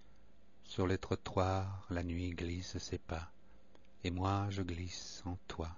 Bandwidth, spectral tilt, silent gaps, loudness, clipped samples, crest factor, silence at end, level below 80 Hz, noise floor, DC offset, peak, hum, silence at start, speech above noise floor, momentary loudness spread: 7.2 kHz; -5.5 dB/octave; none; -40 LUFS; under 0.1%; 22 dB; 0 s; -56 dBFS; -67 dBFS; 0.2%; -18 dBFS; none; 0.65 s; 28 dB; 9 LU